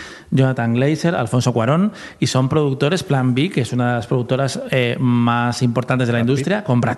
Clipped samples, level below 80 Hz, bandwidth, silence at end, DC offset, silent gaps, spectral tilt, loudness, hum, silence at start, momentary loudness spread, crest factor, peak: under 0.1%; -54 dBFS; 12 kHz; 0 s; under 0.1%; none; -6.5 dB/octave; -18 LUFS; none; 0 s; 3 LU; 14 dB; -2 dBFS